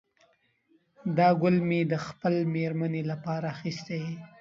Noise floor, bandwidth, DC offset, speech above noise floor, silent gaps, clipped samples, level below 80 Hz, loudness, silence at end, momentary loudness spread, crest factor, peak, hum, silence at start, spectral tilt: -68 dBFS; 7.6 kHz; under 0.1%; 40 dB; none; under 0.1%; -70 dBFS; -28 LUFS; 0.15 s; 12 LU; 18 dB; -12 dBFS; none; 1.05 s; -8 dB/octave